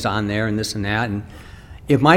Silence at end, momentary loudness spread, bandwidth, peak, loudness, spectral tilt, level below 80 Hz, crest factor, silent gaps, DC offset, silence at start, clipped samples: 0 s; 19 LU; 16.5 kHz; 0 dBFS; -22 LUFS; -5.5 dB/octave; -42 dBFS; 20 dB; none; under 0.1%; 0 s; under 0.1%